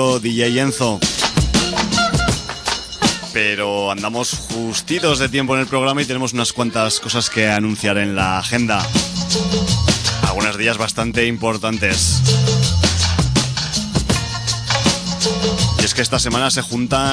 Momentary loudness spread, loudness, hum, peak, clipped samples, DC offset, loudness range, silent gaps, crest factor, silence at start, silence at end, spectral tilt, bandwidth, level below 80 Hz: 4 LU; -17 LUFS; none; -2 dBFS; under 0.1%; under 0.1%; 2 LU; none; 16 dB; 0 s; 0 s; -3.5 dB/octave; 11 kHz; -32 dBFS